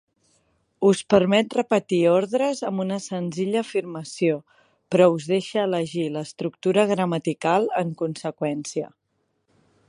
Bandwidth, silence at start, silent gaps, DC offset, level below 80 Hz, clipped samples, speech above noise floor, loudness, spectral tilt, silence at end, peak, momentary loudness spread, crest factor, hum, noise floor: 11 kHz; 0.8 s; none; under 0.1%; -66 dBFS; under 0.1%; 49 dB; -23 LUFS; -6 dB/octave; 1 s; -2 dBFS; 10 LU; 22 dB; none; -72 dBFS